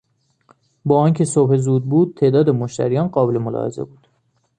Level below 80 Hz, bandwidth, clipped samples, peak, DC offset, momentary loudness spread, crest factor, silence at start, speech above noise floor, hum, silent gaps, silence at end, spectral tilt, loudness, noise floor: -58 dBFS; 9.8 kHz; under 0.1%; -2 dBFS; under 0.1%; 11 LU; 16 dB; 0.85 s; 48 dB; none; none; 0.75 s; -8 dB/octave; -17 LUFS; -64 dBFS